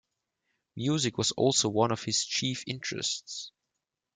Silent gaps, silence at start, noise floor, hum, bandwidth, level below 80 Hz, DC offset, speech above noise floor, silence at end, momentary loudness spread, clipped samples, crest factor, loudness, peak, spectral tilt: none; 0.75 s; -86 dBFS; none; 10 kHz; -70 dBFS; under 0.1%; 56 dB; 0.65 s; 15 LU; under 0.1%; 20 dB; -29 LUFS; -10 dBFS; -3.5 dB/octave